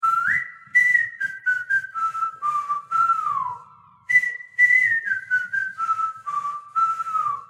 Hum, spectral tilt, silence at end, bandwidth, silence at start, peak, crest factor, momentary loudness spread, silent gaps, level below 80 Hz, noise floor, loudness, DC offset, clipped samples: none; -1 dB/octave; 0.05 s; 15.5 kHz; 0 s; -6 dBFS; 16 dB; 10 LU; none; -76 dBFS; -49 dBFS; -21 LUFS; under 0.1%; under 0.1%